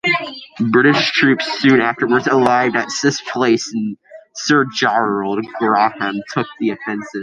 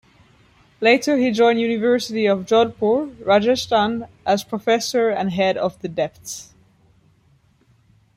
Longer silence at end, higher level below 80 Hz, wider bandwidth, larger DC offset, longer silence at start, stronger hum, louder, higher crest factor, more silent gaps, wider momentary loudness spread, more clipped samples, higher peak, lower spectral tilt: second, 0 s vs 1.75 s; about the same, -60 dBFS vs -58 dBFS; second, 10.5 kHz vs 15.5 kHz; neither; second, 0.05 s vs 0.8 s; neither; first, -16 LUFS vs -19 LUFS; about the same, 16 dB vs 18 dB; neither; about the same, 11 LU vs 9 LU; neither; about the same, -2 dBFS vs -2 dBFS; about the same, -4.5 dB/octave vs -4.5 dB/octave